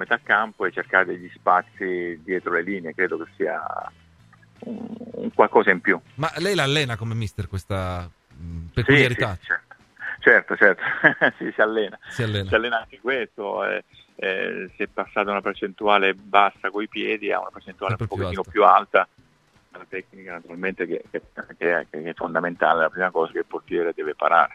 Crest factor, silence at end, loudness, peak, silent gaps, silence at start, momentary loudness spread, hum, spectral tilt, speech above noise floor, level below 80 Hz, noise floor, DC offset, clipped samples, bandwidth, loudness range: 22 dB; 0 s; -22 LUFS; 0 dBFS; none; 0 s; 17 LU; none; -5.5 dB/octave; 37 dB; -52 dBFS; -60 dBFS; under 0.1%; under 0.1%; 13.5 kHz; 6 LU